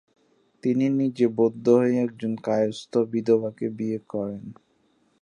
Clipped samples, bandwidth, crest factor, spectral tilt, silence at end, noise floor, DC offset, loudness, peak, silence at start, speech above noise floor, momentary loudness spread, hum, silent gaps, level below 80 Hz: under 0.1%; 9.6 kHz; 18 dB; -7.5 dB/octave; 0.7 s; -66 dBFS; under 0.1%; -24 LUFS; -6 dBFS; 0.65 s; 42 dB; 11 LU; none; none; -70 dBFS